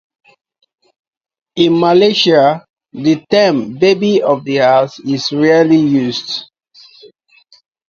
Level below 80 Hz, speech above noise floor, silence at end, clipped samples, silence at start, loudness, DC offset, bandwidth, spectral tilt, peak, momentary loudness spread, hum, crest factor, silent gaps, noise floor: -58 dBFS; 38 dB; 1.45 s; under 0.1%; 1.55 s; -12 LUFS; under 0.1%; 7.4 kHz; -5.5 dB/octave; 0 dBFS; 11 LU; none; 14 dB; 2.70-2.74 s; -49 dBFS